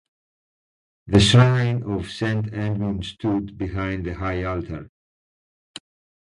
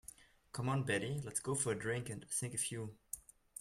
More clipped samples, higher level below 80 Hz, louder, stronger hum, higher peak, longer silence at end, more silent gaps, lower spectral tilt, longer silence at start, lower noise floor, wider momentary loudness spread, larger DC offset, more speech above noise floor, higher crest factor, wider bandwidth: neither; first, -40 dBFS vs -68 dBFS; first, -22 LUFS vs -39 LUFS; neither; first, 0 dBFS vs -22 dBFS; first, 1.35 s vs 0 s; neither; first, -6 dB/octave vs -4 dB/octave; first, 1.05 s vs 0.2 s; first, under -90 dBFS vs -60 dBFS; first, 21 LU vs 12 LU; neither; first, over 69 dB vs 20 dB; about the same, 22 dB vs 18 dB; second, 11 kHz vs 16 kHz